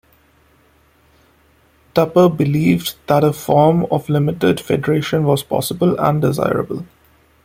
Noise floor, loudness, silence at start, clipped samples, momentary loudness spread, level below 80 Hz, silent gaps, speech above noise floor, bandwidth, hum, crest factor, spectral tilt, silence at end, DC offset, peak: -54 dBFS; -16 LUFS; 1.95 s; under 0.1%; 6 LU; -50 dBFS; none; 39 dB; 16.5 kHz; none; 16 dB; -6.5 dB/octave; 0.6 s; under 0.1%; 0 dBFS